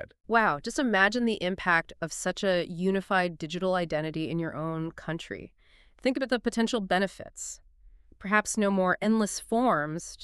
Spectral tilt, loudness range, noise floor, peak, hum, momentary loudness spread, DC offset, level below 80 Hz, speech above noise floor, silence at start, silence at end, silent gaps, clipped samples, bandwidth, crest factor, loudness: -4.5 dB/octave; 5 LU; -55 dBFS; -8 dBFS; none; 12 LU; under 0.1%; -56 dBFS; 27 dB; 0 s; 0 s; none; under 0.1%; 13 kHz; 20 dB; -28 LUFS